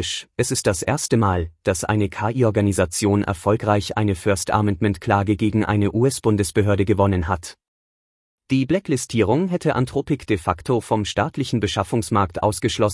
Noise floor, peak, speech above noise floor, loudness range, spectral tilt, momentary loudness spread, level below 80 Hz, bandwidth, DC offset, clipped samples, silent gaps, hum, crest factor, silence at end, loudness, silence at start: under -90 dBFS; -4 dBFS; over 70 dB; 2 LU; -5.5 dB/octave; 4 LU; -46 dBFS; 12 kHz; under 0.1%; under 0.1%; 7.68-8.38 s; none; 16 dB; 0 s; -21 LUFS; 0 s